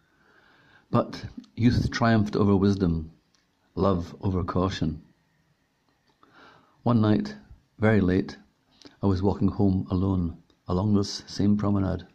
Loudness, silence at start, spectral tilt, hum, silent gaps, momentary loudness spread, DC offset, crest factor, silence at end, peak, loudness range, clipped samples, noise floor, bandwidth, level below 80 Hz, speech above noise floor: -25 LUFS; 0.9 s; -7.5 dB/octave; none; none; 13 LU; under 0.1%; 18 dB; 0.1 s; -8 dBFS; 5 LU; under 0.1%; -69 dBFS; 8.4 kHz; -48 dBFS; 45 dB